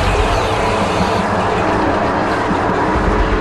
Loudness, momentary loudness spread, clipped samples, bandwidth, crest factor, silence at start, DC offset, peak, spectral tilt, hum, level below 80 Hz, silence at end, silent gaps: -15 LUFS; 1 LU; under 0.1%; 12.5 kHz; 14 dB; 0 s; under 0.1%; -2 dBFS; -5.5 dB/octave; none; -24 dBFS; 0 s; none